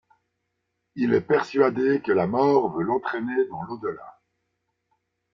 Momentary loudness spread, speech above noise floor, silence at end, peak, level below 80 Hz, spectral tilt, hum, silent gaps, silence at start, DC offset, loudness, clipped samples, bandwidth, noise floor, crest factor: 12 LU; 55 dB; 1.25 s; -6 dBFS; -66 dBFS; -8 dB/octave; none; none; 0.95 s; under 0.1%; -24 LUFS; under 0.1%; 7.2 kHz; -78 dBFS; 18 dB